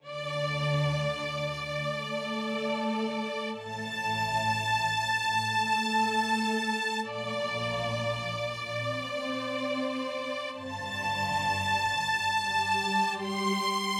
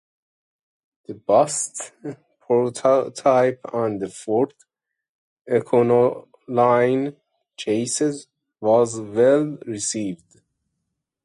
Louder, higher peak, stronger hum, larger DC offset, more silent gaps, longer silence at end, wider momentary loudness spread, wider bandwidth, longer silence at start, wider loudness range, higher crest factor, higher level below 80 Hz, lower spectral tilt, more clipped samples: second, -30 LUFS vs -21 LUFS; second, -16 dBFS vs -4 dBFS; neither; neither; second, none vs 5.09-5.45 s; second, 0 s vs 1.1 s; second, 6 LU vs 15 LU; first, 16.5 kHz vs 11.5 kHz; second, 0.05 s vs 1.1 s; about the same, 4 LU vs 2 LU; about the same, 14 dB vs 18 dB; about the same, -62 dBFS vs -66 dBFS; about the same, -4 dB/octave vs -5 dB/octave; neither